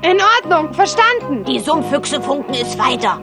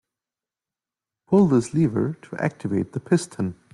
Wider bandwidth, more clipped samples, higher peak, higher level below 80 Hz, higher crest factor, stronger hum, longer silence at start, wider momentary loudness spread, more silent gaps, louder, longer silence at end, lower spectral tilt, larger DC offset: about the same, 12.5 kHz vs 11.5 kHz; neither; first, 0 dBFS vs -6 dBFS; first, -50 dBFS vs -62 dBFS; about the same, 14 dB vs 18 dB; neither; second, 0 s vs 1.3 s; about the same, 8 LU vs 10 LU; neither; first, -15 LUFS vs -23 LUFS; second, 0 s vs 0.2 s; second, -3 dB/octave vs -7.5 dB/octave; neither